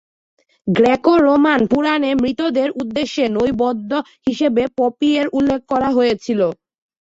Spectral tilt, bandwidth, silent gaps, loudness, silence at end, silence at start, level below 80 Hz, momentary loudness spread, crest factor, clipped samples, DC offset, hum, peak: -6 dB/octave; 7.8 kHz; none; -17 LUFS; 0.45 s; 0.65 s; -50 dBFS; 8 LU; 14 dB; under 0.1%; under 0.1%; none; -2 dBFS